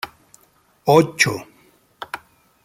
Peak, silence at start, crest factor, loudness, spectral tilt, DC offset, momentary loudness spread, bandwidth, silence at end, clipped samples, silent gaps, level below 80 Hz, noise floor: 0 dBFS; 0.05 s; 22 dB; -17 LUFS; -4.5 dB/octave; under 0.1%; 20 LU; 16 kHz; 0.5 s; under 0.1%; none; -60 dBFS; -58 dBFS